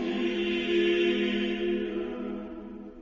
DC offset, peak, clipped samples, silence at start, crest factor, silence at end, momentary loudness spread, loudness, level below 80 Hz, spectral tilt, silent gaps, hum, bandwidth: under 0.1%; -16 dBFS; under 0.1%; 0 s; 14 dB; 0 s; 14 LU; -28 LUFS; -54 dBFS; -6 dB/octave; none; none; 7.4 kHz